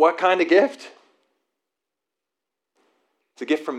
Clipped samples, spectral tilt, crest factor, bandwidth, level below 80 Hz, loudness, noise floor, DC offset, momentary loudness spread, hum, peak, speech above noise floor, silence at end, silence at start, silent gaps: under 0.1%; -4 dB/octave; 20 dB; 10.5 kHz; under -90 dBFS; -19 LUFS; -85 dBFS; under 0.1%; 20 LU; none; -4 dBFS; 65 dB; 0 s; 0 s; none